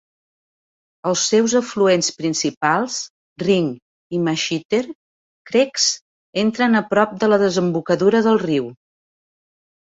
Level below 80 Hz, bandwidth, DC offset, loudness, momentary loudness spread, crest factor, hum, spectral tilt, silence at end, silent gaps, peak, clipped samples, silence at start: -62 dBFS; 8 kHz; under 0.1%; -19 LUFS; 11 LU; 18 dB; none; -4 dB/octave; 1.2 s; 2.57-2.61 s, 3.10-3.36 s, 3.82-4.10 s, 4.65-4.69 s, 4.95-5.45 s, 6.01-6.33 s; -2 dBFS; under 0.1%; 1.05 s